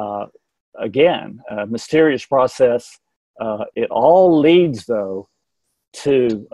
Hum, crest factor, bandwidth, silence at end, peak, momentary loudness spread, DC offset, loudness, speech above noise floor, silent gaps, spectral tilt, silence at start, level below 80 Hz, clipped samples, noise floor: none; 16 dB; 11.5 kHz; 0.1 s; -2 dBFS; 16 LU; under 0.1%; -16 LUFS; 58 dB; 0.60-0.72 s, 3.16-3.34 s, 5.88-5.92 s; -6 dB/octave; 0 s; -58 dBFS; under 0.1%; -74 dBFS